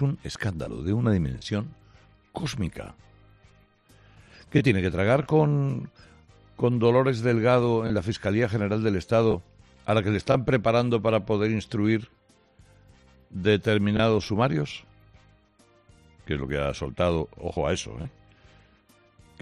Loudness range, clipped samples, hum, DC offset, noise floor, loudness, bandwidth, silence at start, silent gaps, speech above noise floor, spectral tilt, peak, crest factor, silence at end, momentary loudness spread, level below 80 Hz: 7 LU; under 0.1%; none; under 0.1%; -60 dBFS; -25 LUFS; 11.5 kHz; 0 s; none; 36 dB; -7 dB/octave; -8 dBFS; 18 dB; 1.35 s; 12 LU; -50 dBFS